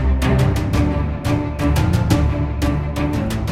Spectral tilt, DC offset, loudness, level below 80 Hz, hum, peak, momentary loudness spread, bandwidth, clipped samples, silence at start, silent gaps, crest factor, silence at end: -7 dB/octave; under 0.1%; -19 LUFS; -22 dBFS; none; -2 dBFS; 4 LU; 15.5 kHz; under 0.1%; 0 s; none; 16 dB; 0 s